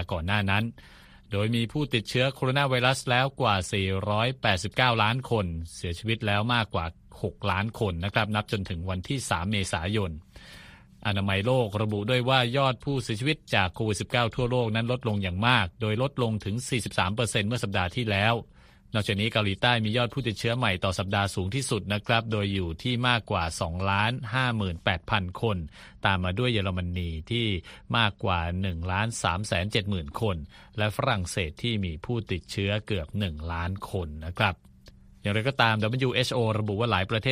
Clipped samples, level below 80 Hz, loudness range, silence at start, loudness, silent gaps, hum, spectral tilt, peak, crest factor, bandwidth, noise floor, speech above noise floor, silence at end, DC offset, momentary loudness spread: under 0.1%; -48 dBFS; 4 LU; 0 s; -27 LUFS; none; none; -5 dB/octave; -6 dBFS; 22 dB; 15.5 kHz; -52 dBFS; 25 dB; 0 s; under 0.1%; 8 LU